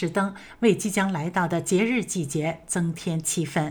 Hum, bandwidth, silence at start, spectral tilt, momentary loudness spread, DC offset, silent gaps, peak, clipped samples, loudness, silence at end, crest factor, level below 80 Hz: none; over 20 kHz; 0 s; -5 dB/octave; 5 LU; under 0.1%; none; -8 dBFS; under 0.1%; -25 LUFS; 0 s; 16 dB; -58 dBFS